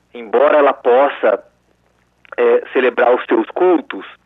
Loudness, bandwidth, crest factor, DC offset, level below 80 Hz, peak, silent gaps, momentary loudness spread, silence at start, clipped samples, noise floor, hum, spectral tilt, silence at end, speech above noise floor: -14 LUFS; 4 kHz; 12 dB; under 0.1%; -66 dBFS; -2 dBFS; none; 7 LU; 0.15 s; under 0.1%; -59 dBFS; 60 Hz at -65 dBFS; -6.5 dB/octave; 0.15 s; 45 dB